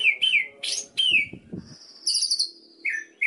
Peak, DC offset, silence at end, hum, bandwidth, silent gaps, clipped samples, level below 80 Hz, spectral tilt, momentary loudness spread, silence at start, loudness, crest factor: -10 dBFS; under 0.1%; 0 s; none; 11.5 kHz; none; under 0.1%; -68 dBFS; 1 dB/octave; 15 LU; 0 s; -23 LUFS; 16 dB